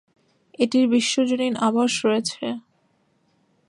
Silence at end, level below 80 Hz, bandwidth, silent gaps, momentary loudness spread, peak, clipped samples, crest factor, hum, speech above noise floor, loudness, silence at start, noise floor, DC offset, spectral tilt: 1.1 s; -72 dBFS; 11 kHz; none; 11 LU; -6 dBFS; under 0.1%; 18 dB; none; 45 dB; -21 LUFS; 0.6 s; -65 dBFS; under 0.1%; -3.5 dB/octave